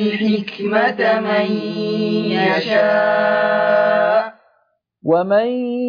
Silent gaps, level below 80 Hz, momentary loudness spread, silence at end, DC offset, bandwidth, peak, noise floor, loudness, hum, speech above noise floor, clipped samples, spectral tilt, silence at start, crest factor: none; -68 dBFS; 6 LU; 0 s; under 0.1%; 5.2 kHz; -4 dBFS; -63 dBFS; -17 LUFS; none; 47 dB; under 0.1%; -7 dB/octave; 0 s; 14 dB